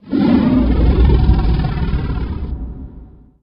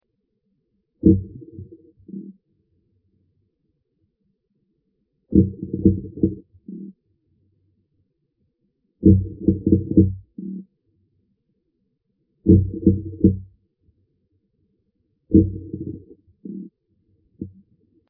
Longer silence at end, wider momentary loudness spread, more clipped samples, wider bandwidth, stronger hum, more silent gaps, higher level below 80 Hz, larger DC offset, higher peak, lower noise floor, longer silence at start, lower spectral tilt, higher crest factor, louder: second, 0.35 s vs 0.6 s; second, 16 LU vs 22 LU; neither; first, 5.4 kHz vs 0.8 kHz; neither; neither; first, -18 dBFS vs -40 dBFS; neither; about the same, 0 dBFS vs -2 dBFS; second, -38 dBFS vs -73 dBFS; second, 0.05 s vs 1.05 s; second, -11 dB/octave vs -17.5 dB/octave; second, 14 dB vs 22 dB; first, -16 LUFS vs -20 LUFS